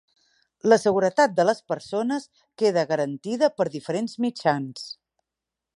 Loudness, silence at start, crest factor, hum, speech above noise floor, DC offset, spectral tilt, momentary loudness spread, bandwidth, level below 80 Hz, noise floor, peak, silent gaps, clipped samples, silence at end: -24 LUFS; 0.65 s; 20 dB; none; 64 dB; under 0.1%; -5 dB/octave; 11 LU; 11.5 kHz; -72 dBFS; -87 dBFS; -4 dBFS; none; under 0.1%; 0.85 s